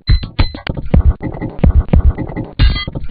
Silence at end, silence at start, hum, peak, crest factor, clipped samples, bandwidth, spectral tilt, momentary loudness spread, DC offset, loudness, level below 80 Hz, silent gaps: 0 s; 0.05 s; none; 0 dBFS; 12 dB; 0.3%; 5 kHz; -10.5 dB/octave; 10 LU; under 0.1%; -16 LUFS; -14 dBFS; none